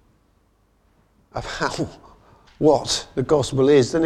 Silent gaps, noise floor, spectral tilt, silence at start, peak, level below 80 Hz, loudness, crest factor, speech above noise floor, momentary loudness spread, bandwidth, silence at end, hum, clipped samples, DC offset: none; -61 dBFS; -5 dB/octave; 1.35 s; -4 dBFS; -48 dBFS; -20 LUFS; 18 dB; 42 dB; 15 LU; 13 kHz; 0 s; none; under 0.1%; under 0.1%